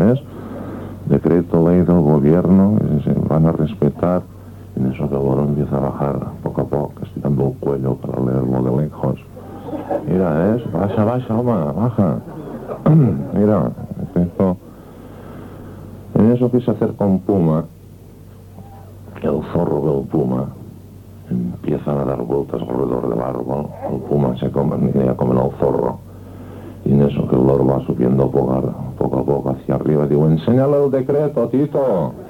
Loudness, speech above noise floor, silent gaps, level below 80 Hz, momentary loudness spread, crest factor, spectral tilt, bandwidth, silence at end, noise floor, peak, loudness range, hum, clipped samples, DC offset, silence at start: -18 LUFS; 23 dB; none; -40 dBFS; 17 LU; 14 dB; -10.5 dB/octave; 16 kHz; 0 s; -39 dBFS; -2 dBFS; 6 LU; none; under 0.1%; under 0.1%; 0 s